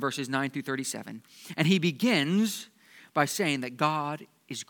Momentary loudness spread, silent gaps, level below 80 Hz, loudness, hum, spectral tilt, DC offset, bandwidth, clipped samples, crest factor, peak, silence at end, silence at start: 16 LU; none; -82 dBFS; -28 LUFS; none; -4.5 dB/octave; under 0.1%; 19 kHz; under 0.1%; 22 dB; -8 dBFS; 0.05 s; 0 s